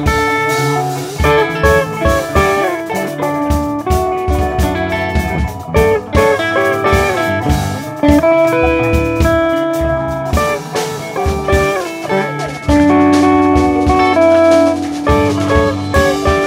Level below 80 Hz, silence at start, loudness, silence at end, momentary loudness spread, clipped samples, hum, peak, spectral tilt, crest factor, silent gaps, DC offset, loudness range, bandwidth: -24 dBFS; 0 s; -13 LUFS; 0 s; 8 LU; under 0.1%; none; 0 dBFS; -6 dB/octave; 12 dB; none; under 0.1%; 4 LU; 16.5 kHz